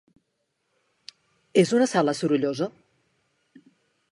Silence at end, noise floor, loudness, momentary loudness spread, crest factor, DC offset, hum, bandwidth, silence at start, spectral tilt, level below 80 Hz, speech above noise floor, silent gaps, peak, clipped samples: 1.45 s; -76 dBFS; -23 LUFS; 9 LU; 22 dB; under 0.1%; none; 11.5 kHz; 1.55 s; -5.5 dB/octave; -76 dBFS; 54 dB; none; -6 dBFS; under 0.1%